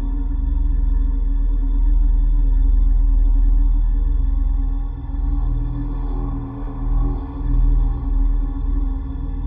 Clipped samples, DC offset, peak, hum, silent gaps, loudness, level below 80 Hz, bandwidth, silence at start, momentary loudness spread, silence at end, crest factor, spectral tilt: under 0.1%; under 0.1%; -8 dBFS; none; none; -23 LUFS; -16 dBFS; 1.8 kHz; 0 s; 7 LU; 0 s; 10 dB; -12.5 dB/octave